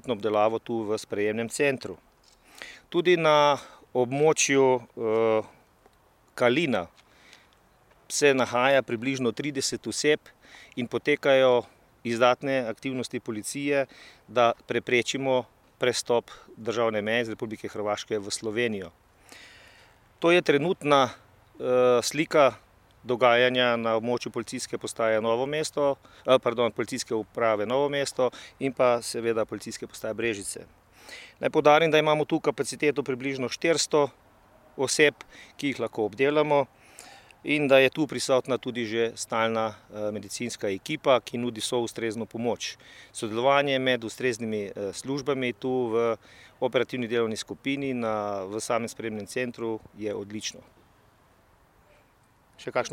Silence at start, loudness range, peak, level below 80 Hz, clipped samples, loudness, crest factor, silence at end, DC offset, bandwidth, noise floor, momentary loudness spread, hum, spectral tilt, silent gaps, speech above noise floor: 0.05 s; 5 LU; -6 dBFS; -66 dBFS; under 0.1%; -26 LUFS; 22 dB; 0 s; under 0.1%; 16 kHz; -62 dBFS; 13 LU; none; -4 dB/octave; none; 36 dB